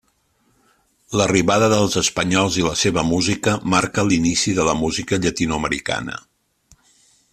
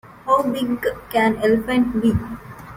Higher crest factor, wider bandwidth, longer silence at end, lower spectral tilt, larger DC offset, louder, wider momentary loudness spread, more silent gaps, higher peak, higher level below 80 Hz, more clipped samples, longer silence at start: about the same, 18 dB vs 16 dB; second, 14.5 kHz vs 16.5 kHz; first, 1.15 s vs 0 s; second, -4 dB/octave vs -6.5 dB/octave; neither; about the same, -18 LUFS vs -20 LUFS; about the same, 7 LU vs 8 LU; neither; about the same, -2 dBFS vs -4 dBFS; about the same, -44 dBFS vs -42 dBFS; neither; first, 1.1 s vs 0.05 s